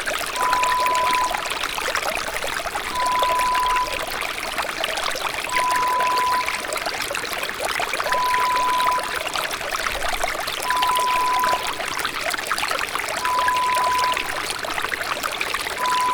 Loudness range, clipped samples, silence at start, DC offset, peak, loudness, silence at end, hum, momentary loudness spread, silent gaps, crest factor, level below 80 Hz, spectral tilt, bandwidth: 1 LU; under 0.1%; 0 s; under 0.1%; -8 dBFS; -22 LUFS; 0 s; none; 5 LU; none; 16 dB; -44 dBFS; -0.5 dB/octave; over 20 kHz